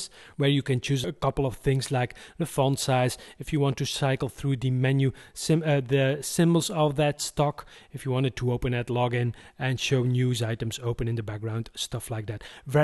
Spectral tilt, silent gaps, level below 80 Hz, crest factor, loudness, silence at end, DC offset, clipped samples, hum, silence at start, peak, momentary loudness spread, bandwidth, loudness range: -5.5 dB/octave; none; -48 dBFS; 16 dB; -27 LUFS; 0 s; under 0.1%; under 0.1%; none; 0 s; -10 dBFS; 9 LU; 12.5 kHz; 3 LU